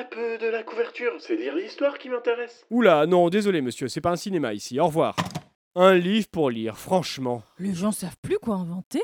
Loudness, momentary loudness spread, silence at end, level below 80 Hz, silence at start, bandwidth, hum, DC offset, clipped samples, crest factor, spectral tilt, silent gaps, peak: -24 LUFS; 12 LU; 0 s; -60 dBFS; 0 s; 17.5 kHz; none; under 0.1%; under 0.1%; 20 dB; -5.5 dB/octave; 5.55-5.71 s, 8.18-8.23 s, 8.84-8.91 s; -4 dBFS